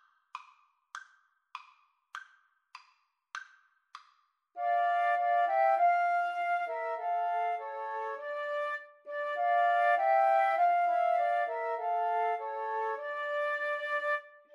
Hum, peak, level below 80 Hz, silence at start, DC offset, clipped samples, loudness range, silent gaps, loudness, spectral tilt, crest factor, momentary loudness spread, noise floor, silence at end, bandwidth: none; -16 dBFS; under -90 dBFS; 0.35 s; under 0.1%; under 0.1%; 22 LU; none; -30 LUFS; 1 dB/octave; 16 dB; 22 LU; -71 dBFS; 0.25 s; 7 kHz